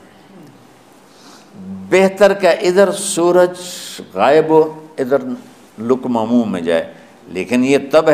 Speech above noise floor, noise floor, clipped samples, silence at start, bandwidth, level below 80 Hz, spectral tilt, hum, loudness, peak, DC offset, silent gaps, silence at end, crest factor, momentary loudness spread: 31 dB; -45 dBFS; under 0.1%; 0.4 s; 15.5 kHz; -58 dBFS; -4.5 dB/octave; none; -14 LUFS; 0 dBFS; 0.1%; none; 0 s; 16 dB; 16 LU